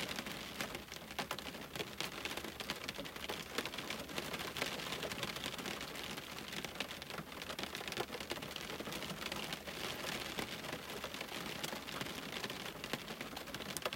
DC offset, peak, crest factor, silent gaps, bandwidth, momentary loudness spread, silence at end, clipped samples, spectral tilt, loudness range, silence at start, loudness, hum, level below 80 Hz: under 0.1%; -18 dBFS; 26 dB; none; 16.5 kHz; 4 LU; 0 s; under 0.1%; -2.5 dB/octave; 2 LU; 0 s; -43 LUFS; none; -66 dBFS